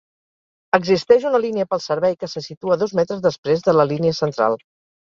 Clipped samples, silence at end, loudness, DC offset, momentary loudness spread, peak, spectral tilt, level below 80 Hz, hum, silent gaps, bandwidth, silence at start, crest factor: under 0.1%; 0.55 s; -19 LUFS; under 0.1%; 7 LU; 0 dBFS; -6 dB/octave; -60 dBFS; none; 2.57-2.61 s, 3.38-3.43 s; 7.4 kHz; 0.75 s; 18 dB